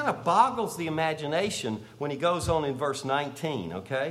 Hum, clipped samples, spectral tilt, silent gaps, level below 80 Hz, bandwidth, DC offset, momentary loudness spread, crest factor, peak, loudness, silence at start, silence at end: none; under 0.1%; -4.5 dB/octave; none; -54 dBFS; 15.5 kHz; under 0.1%; 10 LU; 20 dB; -8 dBFS; -28 LUFS; 0 s; 0 s